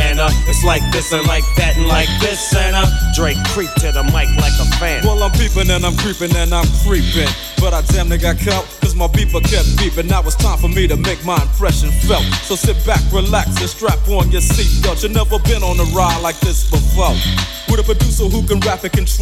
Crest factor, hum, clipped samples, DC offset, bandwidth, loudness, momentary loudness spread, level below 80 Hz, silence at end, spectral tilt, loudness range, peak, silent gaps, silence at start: 12 dB; none; under 0.1%; under 0.1%; 15.5 kHz; -15 LUFS; 3 LU; -16 dBFS; 0 s; -4.5 dB/octave; 1 LU; 0 dBFS; none; 0 s